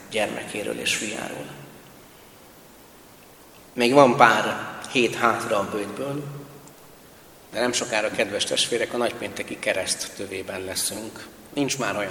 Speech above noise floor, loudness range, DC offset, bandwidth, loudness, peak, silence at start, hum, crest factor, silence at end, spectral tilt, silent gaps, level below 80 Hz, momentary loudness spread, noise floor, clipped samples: 25 dB; 9 LU; under 0.1%; 19 kHz; -23 LUFS; 0 dBFS; 0 s; none; 26 dB; 0 s; -3 dB/octave; none; -62 dBFS; 19 LU; -49 dBFS; under 0.1%